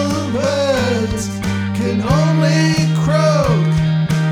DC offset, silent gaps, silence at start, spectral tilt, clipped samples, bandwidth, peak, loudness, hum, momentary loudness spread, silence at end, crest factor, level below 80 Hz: under 0.1%; none; 0 s; -6 dB/octave; under 0.1%; 12.5 kHz; -2 dBFS; -16 LUFS; none; 6 LU; 0 s; 14 dB; -36 dBFS